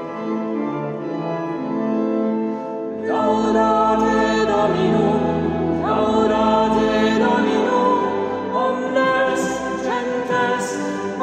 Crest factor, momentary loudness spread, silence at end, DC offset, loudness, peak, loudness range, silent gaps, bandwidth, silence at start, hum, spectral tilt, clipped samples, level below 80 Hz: 14 dB; 8 LU; 0 s; under 0.1%; -19 LUFS; -6 dBFS; 3 LU; none; 10 kHz; 0 s; none; -5.5 dB/octave; under 0.1%; -48 dBFS